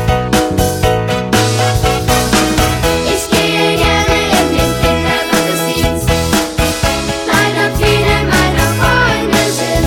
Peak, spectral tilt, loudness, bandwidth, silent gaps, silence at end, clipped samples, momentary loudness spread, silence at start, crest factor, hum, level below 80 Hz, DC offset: 0 dBFS; -4 dB/octave; -12 LUFS; 19 kHz; none; 0 s; under 0.1%; 3 LU; 0 s; 12 dB; none; -22 dBFS; under 0.1%